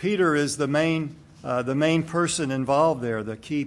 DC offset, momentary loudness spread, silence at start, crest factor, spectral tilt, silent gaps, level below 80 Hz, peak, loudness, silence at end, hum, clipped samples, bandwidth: under 0.1%; 8 LU; 0 s; 16 dB; -5 dB/octave; none; -60 dBFS; -8 dBFS; -24 LUFS; 0 s; none; under 0.1%; 12 kHz